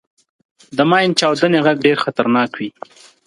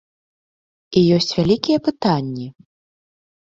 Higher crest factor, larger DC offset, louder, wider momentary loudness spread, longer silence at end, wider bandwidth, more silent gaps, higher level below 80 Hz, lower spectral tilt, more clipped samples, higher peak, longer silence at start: about the same, 16 dB vs 18 dB; neither; first, -15 LUFS vs -18 LUFS; about the same, 11 LU vs 13 LU; second, 0.55 s vs 1 s; first, 11.5 kHz vs 7.8 kHz; neither; second, -64 dBFS vs -52 dBFS; second, -5 dB/octave vs -6.5 dB/octave; neither; about the same, 0 dBFS vs -2 dBFS; second, 0.7 s vs 0.9 s